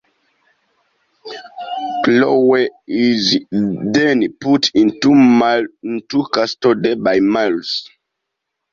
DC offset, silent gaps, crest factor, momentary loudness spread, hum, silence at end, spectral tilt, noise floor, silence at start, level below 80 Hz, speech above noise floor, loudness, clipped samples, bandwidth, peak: under 0.1%; none; 14 dB; 12 LU; none; 0.9 s; -5 dB/octave; -77 dBFS; 1.25 s; -58 dBFS; 63 dB; -15 LUFS; under 0.1%; 7.4 kHz; -2 dBFS